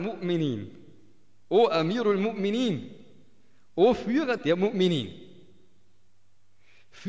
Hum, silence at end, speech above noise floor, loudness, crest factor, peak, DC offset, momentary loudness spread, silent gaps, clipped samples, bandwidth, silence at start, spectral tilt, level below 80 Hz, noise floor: none; 0 s; 45 dB; -26 LUFS; 18 dB; -10 dBFS; 0.3%; 14 LU; none; under 0.1%; 8 kHz; 0 s; -7 dB/octave; -62 dBFS; -70 dBFS